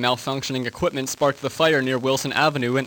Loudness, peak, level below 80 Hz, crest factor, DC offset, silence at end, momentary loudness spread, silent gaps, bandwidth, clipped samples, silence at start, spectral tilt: -22 LUFS; -4 dBFS; -54 dBFS; 18 dB; under 0.1%; 0 s; 6 LU; none; 19 kHz; under 0.1%; 0 s; -4 dB/octave